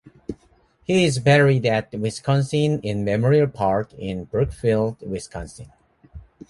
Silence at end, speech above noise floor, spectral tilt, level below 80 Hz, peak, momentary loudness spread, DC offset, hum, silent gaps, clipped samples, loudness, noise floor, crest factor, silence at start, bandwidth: 0.3 s; 38 dB; -6.5 dB/octave; -46 dBFS; -2 dBFS; 19 LU; under 0.1%; none; none; under 0.1%; -21 LUFS; -58 dBFS; 20 dB; 0.05 s; 11.5 kHz